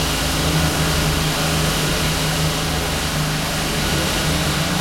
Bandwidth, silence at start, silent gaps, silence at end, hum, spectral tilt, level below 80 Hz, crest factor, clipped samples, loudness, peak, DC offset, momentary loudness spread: 16.5 kHz; 0 s; none; 0 s; none; -3.5 dB/octave; -30 dBFS; 14 dB; under 0.1%; -19 LUFS; -6 dBFS; under 0.1%; 2 LU